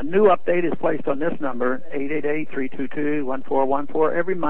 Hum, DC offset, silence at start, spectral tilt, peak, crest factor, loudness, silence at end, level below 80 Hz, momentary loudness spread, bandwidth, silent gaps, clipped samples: none; 8%; 0 s; -10 dB/octave; -4 dBFS; 18 dB; -23 LUFS; 0 s; -60 dBFS; 10 LU; 4.1 kHz; none; under 0.1%